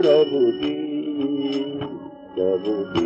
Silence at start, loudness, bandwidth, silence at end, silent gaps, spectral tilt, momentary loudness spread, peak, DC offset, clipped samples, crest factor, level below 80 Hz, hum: 0 s; -23 LUFS; 7.8 kHz; 0 s; none; -7 dB/octave; 14 LU; -6 dBFS; under 0.1%; under 0.1%; 16 dB; -58 dBFS; none